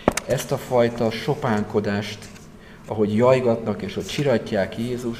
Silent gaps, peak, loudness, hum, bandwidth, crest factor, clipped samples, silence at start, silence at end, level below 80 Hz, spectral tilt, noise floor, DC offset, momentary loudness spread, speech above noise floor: none; 0 dBFS; -22 LUFS; none; 15.5 kHz; 22 dB; under 0.1%; 0 s; 0 s; -48 dBFS; -5.5 dB/octave; -43 dBFS; 0.1%; 10 LU; 21 dB